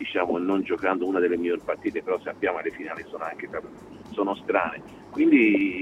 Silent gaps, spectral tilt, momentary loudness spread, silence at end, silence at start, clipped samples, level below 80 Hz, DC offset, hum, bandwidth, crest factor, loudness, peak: none; -7 dB/octave; 16 LU; 0 s; 0 s; under 0.1%; -62 dBFS; under 0.1%; none; 7.8 kHz; 18 dB; -25 LUFS; -8 dBFS